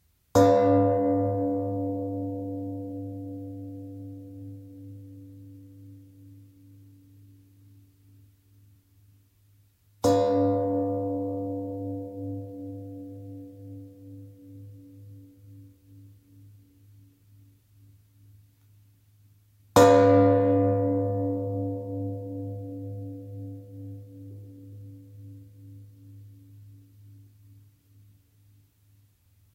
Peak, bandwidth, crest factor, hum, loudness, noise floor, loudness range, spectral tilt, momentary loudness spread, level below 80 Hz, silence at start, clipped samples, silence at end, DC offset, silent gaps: -4 dBFS; 16 kHz; 24 dB; none; -25 LUFS; -62 dBFS; 25 LU; -7 dB/octave; 28 LU; -62 dBFS; 0.35 s; under 0.1%; 2.35 s; under 0.1%; none